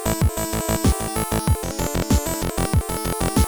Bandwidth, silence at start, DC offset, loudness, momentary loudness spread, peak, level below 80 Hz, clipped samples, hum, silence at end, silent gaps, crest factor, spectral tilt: over 20 kHz; 0 s; under 0.1%; -22 LUFS; 4 LU; -8 dBFS; -28 dBFS; under 0.1%; none; 0 s; none; 14 dB; -5 dB/octave